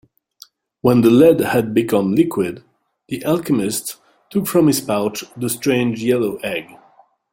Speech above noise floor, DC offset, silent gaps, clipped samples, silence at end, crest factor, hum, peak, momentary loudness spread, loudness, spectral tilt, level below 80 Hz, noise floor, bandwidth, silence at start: 37 dB; under 0.1%; none; under 0.1%; 0.7 s; 16 dB; none; -2 dBFS; 13 LU; -17 LUFS; -5.5 dB/octave; -56 dBFS; -53 dBFS; 17 kHz; 0.85 s